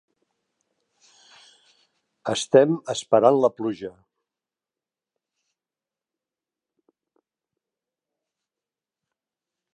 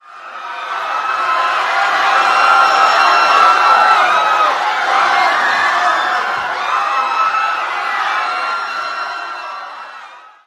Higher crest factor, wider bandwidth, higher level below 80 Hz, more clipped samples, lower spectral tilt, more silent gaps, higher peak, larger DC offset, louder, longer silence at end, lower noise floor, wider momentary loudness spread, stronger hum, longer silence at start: first, 24 dB vs 14 dB; second, 11 kHz vs 13 kHz; second, -74 dBFS vs -64 dBFS; neither; first, -5 dB/octave vs 0 dB/octave; neither; about the same, -2 dBFS vs 0 dBFS; neither; second, -21 LUFS vs -13 LUFS; first, 5.85 s vs 0.25 s; first, under -90 dBFS vs -37 dBFS; about the same, 17 LU vs 15 LU; neither; first, 2.25 s vs 0.1 s